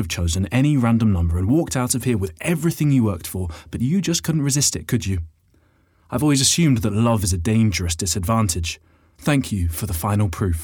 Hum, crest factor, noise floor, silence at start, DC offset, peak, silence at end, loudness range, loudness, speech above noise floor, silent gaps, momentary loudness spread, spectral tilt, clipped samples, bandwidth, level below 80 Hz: none; 16 dB; -59 dBFS; 0 s; under 0.1%; -4 dBFS; 0 s; 2 LU; -20 LUFS; 39 dB; none; 9 LU; -5 dB/octave; under 0.1%; over 20 kHz; -40 dBFS